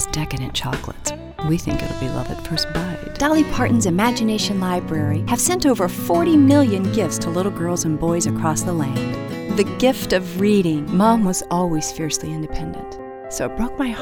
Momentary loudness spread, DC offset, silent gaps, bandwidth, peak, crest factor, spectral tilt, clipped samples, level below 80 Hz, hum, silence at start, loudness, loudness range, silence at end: 11 LU; under 0.1%; none; over 20 kHz; -2 dBFS; 16 dB; -5 dB/octave; under 0.1%; -38 dBFS; none; 0 s; -20 LUFS; 4 LU; 0 s